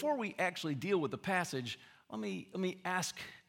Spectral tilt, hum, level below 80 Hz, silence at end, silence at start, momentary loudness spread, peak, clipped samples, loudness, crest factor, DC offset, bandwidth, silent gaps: -4.5 dB/octave; none; -80 dBFS; 0.1 s; 0 s; 8 LU; -18 dBFS; under 0.1%; -37 LUFS; 20 dB; under 0.1%; 17 kHz; none